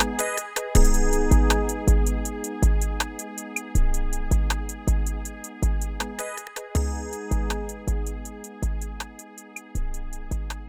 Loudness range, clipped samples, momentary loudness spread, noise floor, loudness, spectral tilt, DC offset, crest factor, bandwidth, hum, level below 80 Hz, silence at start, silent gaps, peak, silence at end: 8 LU; under 0.1%; 14 LU; -43 dBFS; -26 LUFS; -5 dB/octave; 0.1%; 18 dB; 16.5 kHz; none; -24 dBFS; 0 s; none; -4 dBFS; 0 s